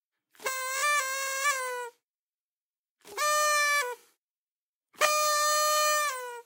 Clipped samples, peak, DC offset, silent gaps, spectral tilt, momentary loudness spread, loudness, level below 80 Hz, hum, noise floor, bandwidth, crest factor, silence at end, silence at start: under 0.1%; -10 dBFS; under 0.1%; 2.03-2.96 s, 4.18-4.81 s; 3.5 dB/octave; 13 LU; -26 LUFS; under -90 dBFS; none; under -90 dBFS; 16 kHz; 20 dB; 0.05 s; 0.4 s